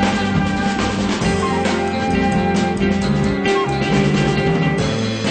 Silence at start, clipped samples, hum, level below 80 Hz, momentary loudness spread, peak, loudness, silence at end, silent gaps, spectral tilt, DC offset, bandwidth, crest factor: 0 s; under 0.1%; none; -34 dBFS; 3 LU; -4 dBFS; -18 LUFS; 0 s; none; -6 dB/octave; under 0.1%; 9.2 kHz; 14 dB